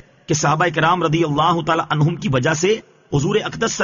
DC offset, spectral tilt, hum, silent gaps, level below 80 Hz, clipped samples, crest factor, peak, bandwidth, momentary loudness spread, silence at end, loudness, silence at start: under 0.1%; -4.5 dB/octave; none; none; -48 dBFS; under 0.1%; 14 dB; -4 dBFS; 7.4 kHz; 5 LU; 0 s; -18 LUFS; 0.3 s